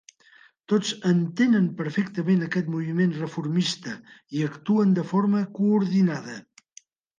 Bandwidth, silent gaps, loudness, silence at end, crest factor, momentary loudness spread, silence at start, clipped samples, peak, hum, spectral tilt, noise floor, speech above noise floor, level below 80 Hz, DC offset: 9.4 kHz; none; -24 LUFS; 0.8 s; 14 dB; 12 LU; 0.7 s; under 0.1%; -10 dBFS; none; -6.5 dB/octave; -56 dBFS; 32 dB; -72 dBFS; under 0.1%